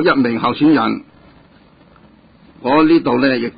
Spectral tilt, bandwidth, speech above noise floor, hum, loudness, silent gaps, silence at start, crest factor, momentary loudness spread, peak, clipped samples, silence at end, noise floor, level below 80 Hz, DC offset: -11.5 dB/octave; 5 kHz; 34 dB; none; -14 LUFS; none; 0 s; 14 dB; 10 LU; -2 dBFS; under 0.1%; 0.1 s; -47 dBFS; -54 dBFS; under 0.1%